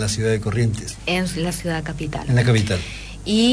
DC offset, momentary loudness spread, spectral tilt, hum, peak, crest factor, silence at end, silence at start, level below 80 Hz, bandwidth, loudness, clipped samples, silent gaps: under 0.1%; 10 LU; -5 dB/octave; none; -6 dBFS; 14 dB; 0 s; 0 s; -38 dBFS; 11 kHz; -21 LUFS; under 0.1%; none